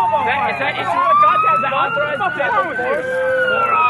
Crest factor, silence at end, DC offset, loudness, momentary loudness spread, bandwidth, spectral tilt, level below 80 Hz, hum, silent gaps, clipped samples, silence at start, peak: 14 dB; 0 s; under 0.1%; -16 LUFS; 7 LU; 12.5 kHz; -5 dB/octave; -58 dBFS; none; none; under 0.1%; 0 s; -4 dBFS